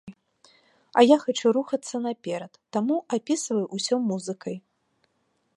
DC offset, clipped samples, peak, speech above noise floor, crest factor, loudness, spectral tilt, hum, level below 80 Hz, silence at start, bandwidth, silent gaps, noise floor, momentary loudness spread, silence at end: under 0.1%; under 0.1%; -4 dBFS; 48 dB; 22 dB; -25 LUFS; -4.5 dB/octave; none; -78 dBFS; 0.05 s; 11.5 kHz; none; -72 dBFS; 15 LU; 0.95 s